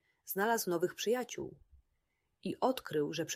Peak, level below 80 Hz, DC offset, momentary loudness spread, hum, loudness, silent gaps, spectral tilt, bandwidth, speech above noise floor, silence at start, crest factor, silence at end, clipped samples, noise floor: -16 dBFS; -72 dBFS; under 0.1%; 12 LU; none; -36 LUFS; none; -4 dB/octave; 16 kHz; 46 dB; 0.25 s; 20 dB; 0 s; under 0.1%; -81 dBFS